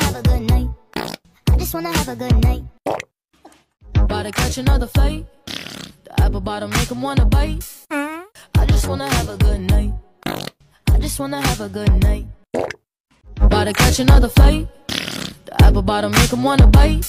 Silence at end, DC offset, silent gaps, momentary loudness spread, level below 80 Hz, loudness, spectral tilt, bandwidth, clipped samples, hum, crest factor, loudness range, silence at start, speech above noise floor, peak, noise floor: 0 s; under 0.1%; 13.00-13.04 s; 15 LU; -18 dBFS; -18 LUFS; -5.5 dB/octave; 16 kHz; under 0.1%; none; 14 dB; 6 LU; 0 s; 20 dB; -2 dBFS; -35 dBFS